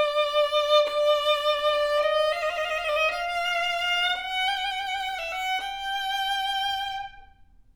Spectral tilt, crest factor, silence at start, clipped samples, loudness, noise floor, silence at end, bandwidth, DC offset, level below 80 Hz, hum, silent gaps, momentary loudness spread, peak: 0.5 dB/octave; 16 dB; 0 s; under 0.1%; -25 LUFS; -54 dBFS; 0.5 s; over 20 kHz; under 0.1%; -56 dBFS; none; none; 7 LU; -10 dBFS